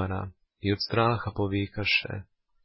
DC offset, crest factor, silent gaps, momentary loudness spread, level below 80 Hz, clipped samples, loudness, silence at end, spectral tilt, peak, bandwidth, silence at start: under 0.1%; 20 dB; none; 13 LU; -48 dBFS; under 0.1%; -28 LUFS; 0.4 s; -9 dB/octave; -10 dBFS; 5.8 kHz; 0 s